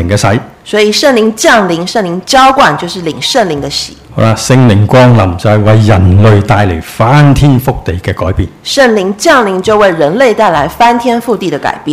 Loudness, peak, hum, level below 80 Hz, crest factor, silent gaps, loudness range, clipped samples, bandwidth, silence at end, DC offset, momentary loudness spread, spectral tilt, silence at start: -8 LUFS; 0 dBFS; none; -28 dBFS; 8 dB; none; 2 LU; 3%; 15.5 kHz; 0 s; under 0.1%; 9 LU; -5.5 dB/octave; 0 s